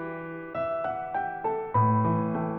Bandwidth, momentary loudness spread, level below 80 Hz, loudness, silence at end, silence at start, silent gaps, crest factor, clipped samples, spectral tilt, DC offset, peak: 3.6 kHz; 11 LU; -60 dBFS; -28 LUFS; 0 s; 0 s; none; 14 dB; under 0.1%; -12 dB/octave; under 0.1%; -14 dBFS